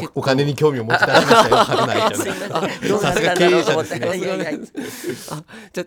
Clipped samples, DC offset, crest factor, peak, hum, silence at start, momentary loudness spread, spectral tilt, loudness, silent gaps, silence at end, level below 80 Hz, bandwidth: under 0.1%; under 0.1%; 18 dB; 0 dBFS; none; 0 s; 16 LU; -4.5 dB/octave; -17 LUFS; none; 0 s; -52 dBFS; 17.5 kHz